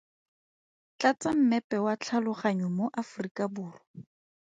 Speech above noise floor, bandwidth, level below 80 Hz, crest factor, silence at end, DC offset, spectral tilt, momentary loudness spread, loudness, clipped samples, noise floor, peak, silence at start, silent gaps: over 61 dB; 9.2 kHz; -74 dBFS; 20 dB; 0.45 s; under 0.1%; -6 dB/octave; 10 LU; -29 LUFS; under 0.1%; under -90 dBFS; -10 dBFS; 1 s; 1.64-1.70 s, 3.31-3.35 s, 3.87-3.94 s